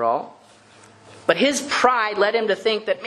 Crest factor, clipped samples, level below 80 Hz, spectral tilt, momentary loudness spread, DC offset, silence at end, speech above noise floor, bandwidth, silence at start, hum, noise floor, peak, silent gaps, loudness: 22 dB; under 0.1%; -68 dBFS; -2.5 dB/octave; 8 LU; under 0.1%; 0 s; 29 dB; 12.5 kHz; 0 s; none; -49 dBFS; 0 dBFS; none; -20 LUFS